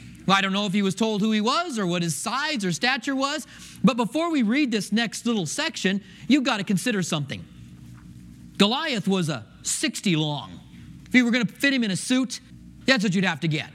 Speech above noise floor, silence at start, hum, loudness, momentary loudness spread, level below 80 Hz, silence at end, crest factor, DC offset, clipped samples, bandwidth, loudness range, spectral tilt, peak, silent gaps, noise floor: 20 dB; 0 s; none; -24 LUFS; 9 LU; -60 dBFS; 0 s; 22 dB; under 0.1%; under 0.1%; 15.5 kHz; 3 LU; -4 dB/octave; -4 dBFS; none; -44 dBFS